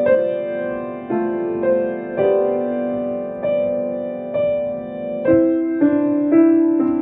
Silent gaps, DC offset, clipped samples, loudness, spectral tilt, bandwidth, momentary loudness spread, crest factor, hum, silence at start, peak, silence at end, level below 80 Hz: none; under 0.1%; under 0.1%; -19 LUFS; -11.5 dB/octave; 3.8 kHz; 10 LU; 16 dB; none; 0 s; -4 dBFS; 0 s; -54 dBFS